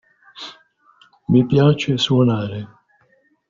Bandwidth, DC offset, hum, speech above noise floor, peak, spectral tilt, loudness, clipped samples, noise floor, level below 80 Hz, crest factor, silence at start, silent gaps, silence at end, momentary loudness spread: 7.6 kHz; under 0.1%; none; 44 dB; -2 dBFS; -6 dB/octave; -17 LUFS; under 0.1%; -60 dBFS; -52 dBFS; 16 dB; 0.35 s; none; 0.85 s; 21 LU